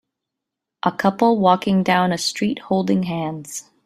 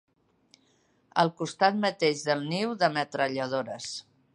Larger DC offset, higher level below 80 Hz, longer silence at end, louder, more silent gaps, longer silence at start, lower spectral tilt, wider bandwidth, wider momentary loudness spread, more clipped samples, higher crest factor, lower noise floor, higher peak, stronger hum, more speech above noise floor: neither; first, -60 dBFS vs -78 dBFS; about the same, 0.25 s vs 0.35 s; first, -19 LUFS vs -28 LUFS; neither; second, 0.85 s vs 1.15 s; about the same, -5 dB/octave vs -4.5 dB/octave; first, 14 kHz vs 11.5 kHz; about the same, 10 LU vs 10 LU; neither; about the same, 18 dB vs 22 dB; first, -83 dBFS vs -67 dBFS; first, -2 dBFS vs -8 dBFS; neither; first, 64 dB vs 40 dB